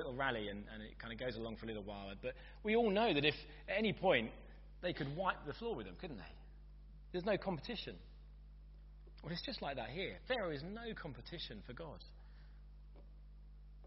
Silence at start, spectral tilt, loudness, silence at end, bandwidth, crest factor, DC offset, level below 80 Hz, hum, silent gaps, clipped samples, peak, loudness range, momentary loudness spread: 0 s; -3 dB/octave; -41 LUFS; 0 s; 5.8 kHz; 24 dB; under 0.1%; -56 dBFS; 50 Hz at -55 dBFS; none; under 0.1%; -18 dBFS; 9 LU; 26 LU